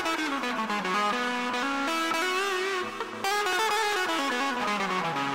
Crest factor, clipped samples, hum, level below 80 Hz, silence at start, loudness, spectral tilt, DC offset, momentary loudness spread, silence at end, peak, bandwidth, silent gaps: 14 dB; under 0.1%; none; -66 dBFS; 0 s; -27 LUFS; -2.5 dB/octave; 0.1%; 4 LU; 0 s; -14 dBFS; 16 kHz; none